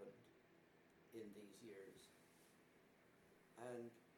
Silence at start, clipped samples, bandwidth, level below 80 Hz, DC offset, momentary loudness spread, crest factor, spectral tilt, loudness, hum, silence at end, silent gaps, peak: 0 s; under 0.1%; 19 kHz; under -90 dBFS; under 0.1%; 12 LU; 22 dB; -5 dB/octave; -59 LUFS; none; 0 s; none; -40 dBFS